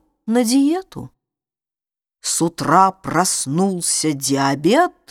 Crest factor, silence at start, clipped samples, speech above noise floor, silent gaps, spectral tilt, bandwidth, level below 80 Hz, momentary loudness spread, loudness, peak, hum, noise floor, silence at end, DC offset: 18 dB; 0.25 s; under 0.1%; over 73 dB; none; -4 dB/octave; 17.5 kHz; -56 dBFS; 8 LU; -17 LUFS; 0 dBFS; none; under -90 dBFS; 0.2 s; under 0.1%